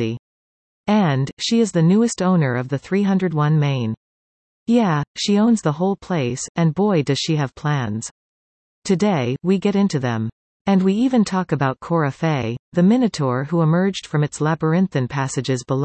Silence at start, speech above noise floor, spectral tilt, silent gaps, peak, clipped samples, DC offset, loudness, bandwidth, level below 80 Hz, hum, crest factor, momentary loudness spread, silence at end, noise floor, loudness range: 0 s; over 72 dB; -6.5 dB/octave; 0.19-0.84 s, 1.33-1.37 s, 3.97-4.66 s, 5.07-5.15 s, 6.49-6.55 s, 8.11-8.82 s, 10.32-10.65 s, 12.59-12.72 s; -4 dBFS; under 0.1%; under 0.1%; -19 LUFS; 8.8 kHz; -56 dBFS; none; 14 dB; 8 LU; 0 s; under -90 dBFS; 2 LU